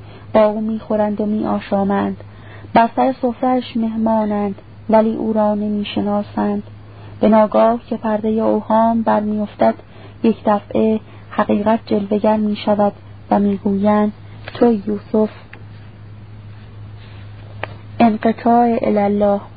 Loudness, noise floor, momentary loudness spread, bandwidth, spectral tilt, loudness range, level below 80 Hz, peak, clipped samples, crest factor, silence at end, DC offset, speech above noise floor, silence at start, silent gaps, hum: -17 LUFS; -36 dBFS; 22 LU; 4.9 kHz; -12.5 dB/octave; 4 LU; -48 dBFS; 0 dBFS; under 0.1%; 16 dB; 0 s; 0.5%; 21 dB; 0 s; none; none